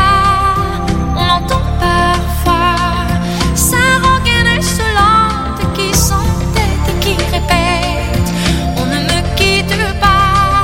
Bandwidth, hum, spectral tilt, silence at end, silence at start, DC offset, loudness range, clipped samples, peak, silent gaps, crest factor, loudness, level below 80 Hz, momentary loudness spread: 17 kHz; none; -4 dB/octave; 0 s; 0 s; under 0.1%; 2 LU; under 0.1%; 0 dBFS; none; 12 dB; -12 LUFS; -20 dBFS; 6 LU